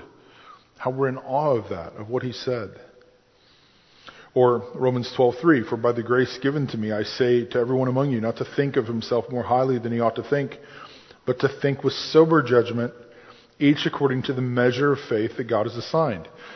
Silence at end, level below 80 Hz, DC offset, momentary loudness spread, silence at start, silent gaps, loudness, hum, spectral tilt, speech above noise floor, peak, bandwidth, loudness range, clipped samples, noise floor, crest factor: 0 s; -60 dBFS; under 0.1%; 9 LU; 0 s; none; -23 LUFS; none; -7 dB/octave; 35 dB; -4 dBFS; 6.4 kHz; 6 LU; under 0.1%; -58 dBFS; 20 dB